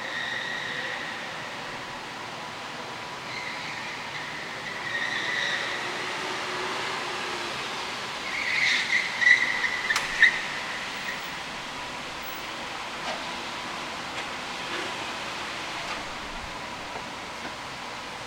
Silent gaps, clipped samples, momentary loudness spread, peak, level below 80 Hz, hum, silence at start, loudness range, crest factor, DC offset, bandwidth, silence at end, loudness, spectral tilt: none; under 0.1%; 14 LU; -6 dBFS; -58 dBFS; none; 0 s; 11 LU; 24 dB; under 0.1%; 16.5 kHz; 0 s; -28 LUFS; -1.5 dB/octave